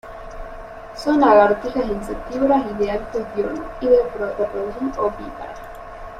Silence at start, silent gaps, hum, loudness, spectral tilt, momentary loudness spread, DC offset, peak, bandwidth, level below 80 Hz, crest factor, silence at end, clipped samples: 0.05 s; none; none; -20 LUFS; -6.5 dB/octave; 22 LU; under 0.1%; -2 dBFS; 13.5 kHz; -40 dBFS; 18 dB; 0 s; under 0.1%